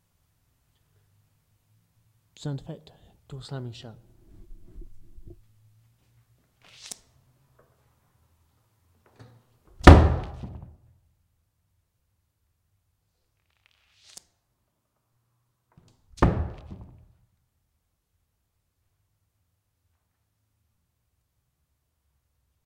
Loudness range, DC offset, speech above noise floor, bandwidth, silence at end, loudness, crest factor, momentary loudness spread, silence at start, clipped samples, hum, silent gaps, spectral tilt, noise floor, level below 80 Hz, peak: 27 LU; under 0.1%; 38 dB; 11 kHz; 6.15 s; -21 LUFS; 30 dB; 32 LU; 2.45 s; under 0.1%; none; none; -7 dB/octave; -76 dBFS; -36 dBFS; 0 dBFS